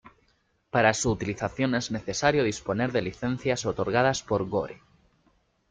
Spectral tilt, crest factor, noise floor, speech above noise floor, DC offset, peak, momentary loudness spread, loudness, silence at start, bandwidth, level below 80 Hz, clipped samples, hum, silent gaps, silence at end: -4.5 dB/octave; 20 dB; -69 dBFS; 42 dB; under 0.1%; -8 dBFS; 7 LU; -27 LUFS; 0.05 s; 9.6 kHz; -54 dBFS; under 0.1%; none; none; 0.95 s